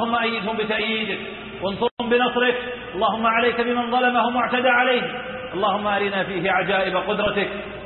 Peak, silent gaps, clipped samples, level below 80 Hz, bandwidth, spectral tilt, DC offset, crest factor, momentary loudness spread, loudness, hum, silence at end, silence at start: -6 dBFS; 1.91-1.97 s; under 0.1%; -52 dBFS; 4.3 kHz; -9.5 dB/octave; under 0.1%; 16 dB; 10 LU; -21 LUFS; none; 0 s; 0 s